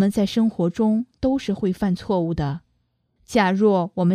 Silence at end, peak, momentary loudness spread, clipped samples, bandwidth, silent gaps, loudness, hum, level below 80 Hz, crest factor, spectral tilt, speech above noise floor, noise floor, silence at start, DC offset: 0 s; -4 dBFS; 6 LU; under 0.1%; 14 kHz; none; -22 LUFS; none; -48 dBFS; 16 dB; -7 dB/octave; 48 dB; -69 dBFS; 0 s; under 0.1%